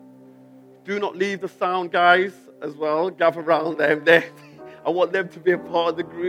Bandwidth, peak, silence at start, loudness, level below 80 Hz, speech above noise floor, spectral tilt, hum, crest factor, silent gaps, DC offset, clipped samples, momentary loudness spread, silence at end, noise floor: 13.5 kHz; 0 dBFS; 0.85 s; -21 LUFS; -72 dBFS; 27 dB; -5.5 dB/octave; none; 22 dB; none; under 0.1%; under 0.1%; 13 LU; 0 s; -48 dBFS